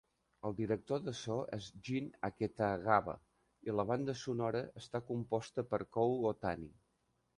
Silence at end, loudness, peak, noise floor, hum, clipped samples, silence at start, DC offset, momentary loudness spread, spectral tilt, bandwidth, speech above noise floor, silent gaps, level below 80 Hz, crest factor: 0.65 s; -38 LUFS; -14 dBFS; -80 dBFS; none; under 0.1%; 0.45 s; under 0.1%; 11 LU; -6.5 dB/octave; 11 kHz; 42 dB; none; -66 dBFS; 24 dB